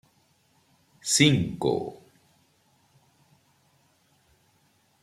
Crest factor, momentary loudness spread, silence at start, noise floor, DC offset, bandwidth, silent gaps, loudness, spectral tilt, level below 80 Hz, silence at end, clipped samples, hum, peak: 26 dB; 16 LU; 1.05 s; -66 dBFS; under 0.1%; 15.5 kHz; none; -24 LUFS; -4 dB/octave; -60 dBFS; 3.1 s; under 0.1%; none; -4 dBFS